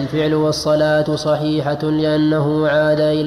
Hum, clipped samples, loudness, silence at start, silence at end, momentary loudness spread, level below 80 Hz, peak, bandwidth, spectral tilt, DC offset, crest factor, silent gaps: none; under 0.1%; -17 LUFS; 0 s; 0 s; 3 LU; -46 dBFS; -4 dBFS; 13 kHz; -6.5 dB/octave; under 0.1%; 12 dB; none